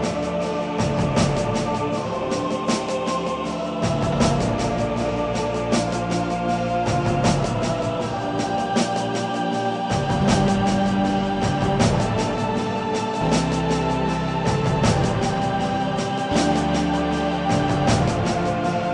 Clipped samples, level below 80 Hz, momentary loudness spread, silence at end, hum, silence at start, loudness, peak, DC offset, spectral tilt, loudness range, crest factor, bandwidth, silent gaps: under 0.1%; -38 dBFS; 5 LU; 0 s; none; 0 s; -22 LUFS; -6 dBFS; under 0.1%; -5.5 dB/octave; 2 LU; 16 dB; 11 kHz; none